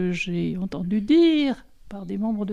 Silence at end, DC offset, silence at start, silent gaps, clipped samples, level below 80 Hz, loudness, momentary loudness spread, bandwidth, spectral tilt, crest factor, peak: 0 s; under 0.1%; 0 s; none; under 0.1%; -50 dBFS; -23 LUFS; 17 LU; 8 kHz; -7 dB/octave; 14 dB; -10 dBFS